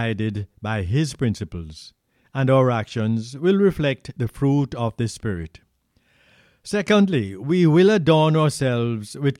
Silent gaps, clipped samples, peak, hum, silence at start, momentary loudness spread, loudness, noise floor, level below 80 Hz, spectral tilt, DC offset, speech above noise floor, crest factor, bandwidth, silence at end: none; under 0.1%; -4 dBFS; none; 0 s; 14 LU; -21 LUFS; -64 dBFS; -48 dBFS; -7 dB/octave; under 0.1%; 44 dB; 18 dB; 13 kHz; 0.05 s